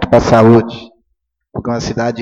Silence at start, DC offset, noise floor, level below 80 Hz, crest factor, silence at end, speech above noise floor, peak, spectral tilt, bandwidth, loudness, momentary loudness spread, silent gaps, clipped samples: 0 s; under 0.1%; -69 dBFS; -36 dBFS; 12 dB; 0 s; 58 dB; 0 dBFS; -7 dB/octave; 7.8 kHz; -11 LUFS; 19 LU; none; 0.1%